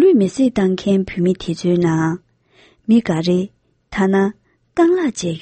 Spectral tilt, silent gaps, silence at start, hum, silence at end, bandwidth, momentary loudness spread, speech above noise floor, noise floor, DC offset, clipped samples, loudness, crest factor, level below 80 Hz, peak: -6.5 dB/octave; none; 0 s; none; 0.05 s; 8.8 kHz; 9 LU; 37 dB; -53 dBFS; under 0.1%; under 0.1%; -17 LUFS; 14 dB; -48 dBFS; -2 dBFS